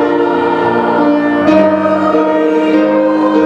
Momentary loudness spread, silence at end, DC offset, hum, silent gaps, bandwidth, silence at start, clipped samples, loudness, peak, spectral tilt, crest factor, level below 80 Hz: 3 LU; 0 s; under 0.1%; none; none; 7.2 kHz; 0 s; under 0.1%; -11 LUFS; 0 dBFS; -7.5 dB/octave; 10 dB; -52 dBFS